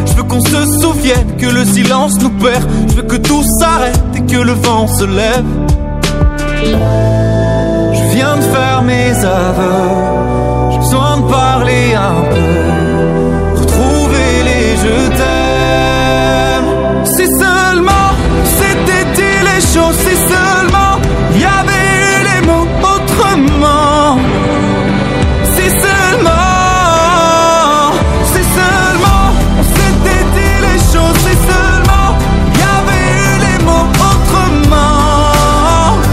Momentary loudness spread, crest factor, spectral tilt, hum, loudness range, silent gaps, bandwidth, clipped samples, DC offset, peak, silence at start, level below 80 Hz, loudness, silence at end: 3 LU; 8 dB; -5 dB/octave; none; 2 LU; none; 16.5 kHz; under 0.1%; under 0.1%; 0 dBFS; 0 s; -16 dBFS; -10 LUFS; 0 s